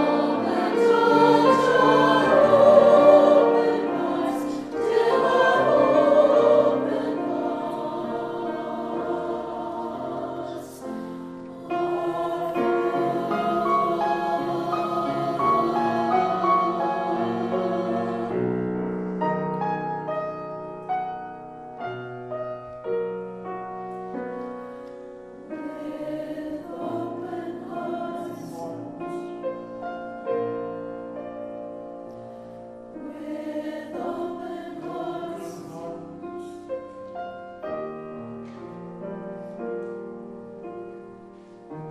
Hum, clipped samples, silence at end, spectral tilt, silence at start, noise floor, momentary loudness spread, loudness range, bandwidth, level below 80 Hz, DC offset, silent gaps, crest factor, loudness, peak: none; under 0.1%; 0 s; -6.5 dB/octave; 0 s; -45 dBFS; 20 LU; 18 LU; 13 kHz; -62 dBFS; under 0.1%; none; 22 dB; -23 LUFS; -2 dBFS